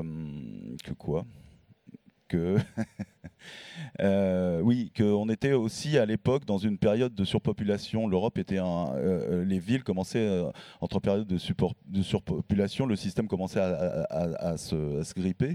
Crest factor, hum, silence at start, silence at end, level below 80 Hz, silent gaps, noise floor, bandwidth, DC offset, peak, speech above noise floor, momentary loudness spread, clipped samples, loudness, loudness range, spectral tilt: 18 dB; none; 0 s; 0 s; -54 dBFS; none; -55 dBFS; 13 kHz; under 0.1%; -10 dBFS; 27 dB; 12 LU; under 0.1%; -29 LUFS; 6 LU; -7 dB/octave